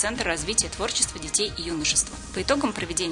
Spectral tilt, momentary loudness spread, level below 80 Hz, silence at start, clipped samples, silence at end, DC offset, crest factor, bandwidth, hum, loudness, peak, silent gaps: -2 dB/octave; 5 LU; -42 dBFS; 0 s; under 0.1%; 0 s; under 0.1%; 22 dB; 11 kHz; none; -24 LUFS; -4 dBFS; none